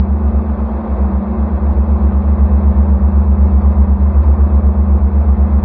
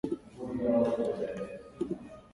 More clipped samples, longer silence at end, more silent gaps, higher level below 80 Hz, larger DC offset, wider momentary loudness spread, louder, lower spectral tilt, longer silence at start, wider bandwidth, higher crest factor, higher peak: neither; about the same, 0 s vs 0.05 s; neither; first, -12 dBFS vs -60 dBFS; neither; second, 5 LU vs 13 LU; first, -13 LUFS vs -33 LUFS; first, -14 dB/octave vs -8 dB/octave; about the same, 0 s vs 0.05 s; second, 2.2 kHz vs 11.5 kHz; second, 10 dB vs 18 dB; first, 0 dBFS vs -16 dBFS